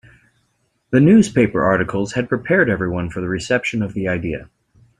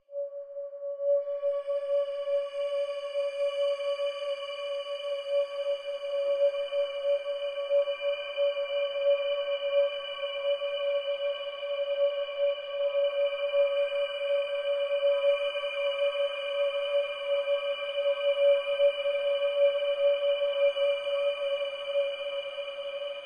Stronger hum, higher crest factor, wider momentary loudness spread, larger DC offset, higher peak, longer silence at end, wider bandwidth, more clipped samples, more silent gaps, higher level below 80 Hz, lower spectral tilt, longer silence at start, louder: neither; about the same, 18 dB vs 14 dB; first, 11 LU vs 8 LU; neither; first, -2 dBFS vs -16 dBFS; first, 0.55 s vs 0 s; first, 10.5 kHz vs 9.4 kHz; neither; neither; first, -46 dBFS vs -76 dBFS; first, -6.5 dB/octave vs -0.5 dB/octave; first, 0.9 s vs 0.1 s; first, -18 LUFS vs -29 LUFS